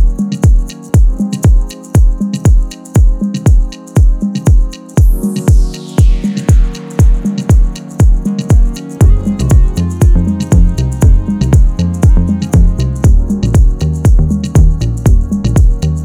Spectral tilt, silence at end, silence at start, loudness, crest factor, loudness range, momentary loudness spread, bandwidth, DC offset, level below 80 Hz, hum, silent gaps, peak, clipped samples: -7.5 dB/octave; 0 s; 0 s; -12 LUFS; 8 dB; 1 LU; 4 LU; 13 kHz; under 0.1%; -10 dBFS; none; none; 0 dBFS; 0.8%